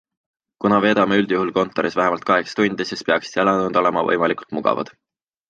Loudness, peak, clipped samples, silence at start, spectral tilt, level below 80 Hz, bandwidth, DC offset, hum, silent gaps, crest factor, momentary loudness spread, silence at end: -19 LUFS; -2 dBFS; under 0.1%; 0.6 s; -5.5 dB/octave; -58 dBFS; 8.8 kHz; under 0.1%; none; none; 18 dB; 6 LU; 0.65 s